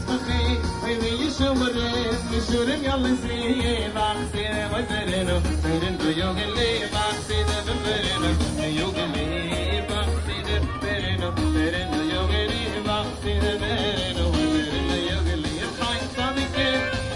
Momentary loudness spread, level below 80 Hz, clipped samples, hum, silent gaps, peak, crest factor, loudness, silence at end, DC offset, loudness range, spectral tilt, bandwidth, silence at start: 3 LU; -34 dBFS; under 0.1%; none; none; -10 dBFS; 14 dB; -24 LUFS; 0 s; under 0.1%; 1 LU; -5 dB/octave; 11.5 kHz; 0 s